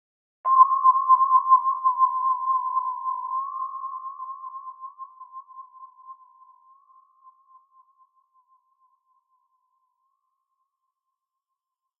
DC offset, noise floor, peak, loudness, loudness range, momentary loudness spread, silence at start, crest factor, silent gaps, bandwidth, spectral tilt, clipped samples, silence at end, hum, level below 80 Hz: under 0.1%; -85 dBFS; -4 dBFS; -21 LUFS; 24 LU; 24 LU; 0.45 s; 22 dB; none; 1.6 kHz; 10 dB/octave; under 0.1%; 5.85 s; none; under -90 dBFS